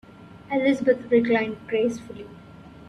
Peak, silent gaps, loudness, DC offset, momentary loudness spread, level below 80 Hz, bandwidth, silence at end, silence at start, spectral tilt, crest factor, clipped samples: -8 dBFS; none; -23 LUFS; under 0.1%; 20 LU; -60 dBFS; 10.5 kHz; 0.05 s; 0.2 s; -6 dB/octave; 16 dB; under 0.1%